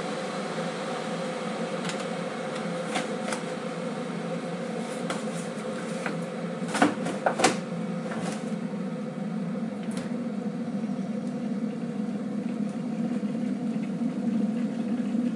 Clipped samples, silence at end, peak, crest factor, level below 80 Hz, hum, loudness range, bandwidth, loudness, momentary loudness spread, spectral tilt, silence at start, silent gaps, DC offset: under 0.1%; 0 s; -6 dBFS; 24 dB; -78 dBFS; none; 4 LU; 11.5 kHz; -30 LUFS; 6 LU; -5.5 dB/octave; 0 s; none; under 0.1%